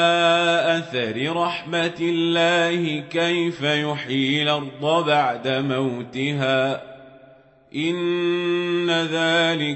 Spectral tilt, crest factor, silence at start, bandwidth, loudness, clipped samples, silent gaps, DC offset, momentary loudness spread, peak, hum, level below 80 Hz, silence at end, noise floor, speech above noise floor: -5 dB/octave; 16 dB; 0 s; 8.4 kHz; -21 LUFS; under 0.1%; none; under 0.1%; 7 LU; -6 dBFS; none; -68 dBFS; 0 s; -51 dBFS; 29 dB